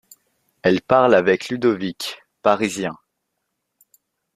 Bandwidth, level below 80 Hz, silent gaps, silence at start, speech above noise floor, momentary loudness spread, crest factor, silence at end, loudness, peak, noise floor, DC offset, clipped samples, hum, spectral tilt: 15 kHz; -60 dBFS; none; 0.65 s; 58 dB; 14 LU; 20 dB; 1.4 s; -19 LUFS; -2 dBFS; -76 dBFS; under 0.1%; under 0.1%; none; -5 dB/octave